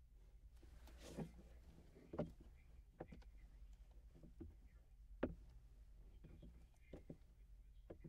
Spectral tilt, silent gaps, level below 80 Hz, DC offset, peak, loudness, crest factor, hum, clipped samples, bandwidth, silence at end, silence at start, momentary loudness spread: -7 dB/octave; none; -62 dBFS; under 0.1%; -26 dBFS; -59 LUFS; 30 dB; none; under 0.1%; 15 kHz; 0 s; 0 s; 17 LU